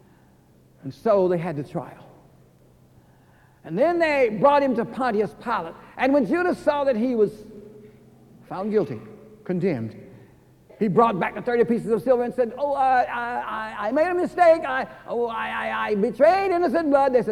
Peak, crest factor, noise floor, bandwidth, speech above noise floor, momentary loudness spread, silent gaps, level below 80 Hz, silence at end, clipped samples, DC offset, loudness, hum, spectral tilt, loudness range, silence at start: -6 dBFS; 18 dB; -55 dBFS; 13.5 kHz; 33 dB; 13 LU; none; -58 dBFS; 0 s; under 0.1%; under 0.1%; -22 LUFS; none; -7 dB/octave; 7 LU; 0.85 s